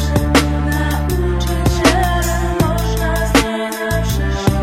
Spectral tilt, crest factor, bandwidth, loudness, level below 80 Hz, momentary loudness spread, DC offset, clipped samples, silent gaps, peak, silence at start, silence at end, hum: -5 dB/octave; 16 dB; 16.5 kHz; -16 LUFS; -20 dBFS; 5 LU; 0.2%; under 0.1%; none; 0 dBFS; 0 s; 0 s; none